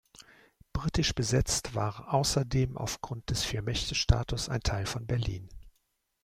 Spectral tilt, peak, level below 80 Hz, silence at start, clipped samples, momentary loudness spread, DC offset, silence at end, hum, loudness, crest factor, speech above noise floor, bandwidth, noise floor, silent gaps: -4.5 dB/octave; -10 dBFS; -40 dBFS; 0.2 s; under 0.1%; 8 LU; under 0.1%; 0.55 s; none; -31 LUFS; 22 dB; 46 dB; 16 kHz; -76 dBFS; none